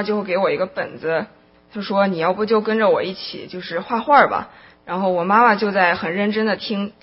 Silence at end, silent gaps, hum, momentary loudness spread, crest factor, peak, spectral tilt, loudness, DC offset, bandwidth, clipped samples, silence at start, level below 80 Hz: 0.1 s; none; none; 15 LU; 20 dB; 0 dBFS; -9 dB/octave; -19 LUFS; under 0.1%; 5.8 kHz; under 0.1%; 0 s; -60 dBFS